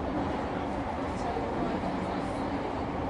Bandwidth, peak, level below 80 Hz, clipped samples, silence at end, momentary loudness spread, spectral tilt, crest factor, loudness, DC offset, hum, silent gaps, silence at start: 11.5 kHz; -18 dBFS; -44 dBFS; under 0.1%; 0 s; 2 LU; -7 dB/octave; 14 dB; -32 LUFS; under 0.1%; none; none; 0 s